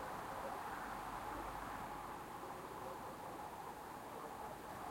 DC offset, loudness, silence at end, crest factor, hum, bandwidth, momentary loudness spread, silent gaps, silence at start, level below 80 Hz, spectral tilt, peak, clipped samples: under 0.1%; -48 LUFS; 0 s; 14 dB; none; 16.5 kHz; 4 LU; none; 0 s; -64 dBFS; -4.5 dB/octave; -34 dBFS; under 0.1%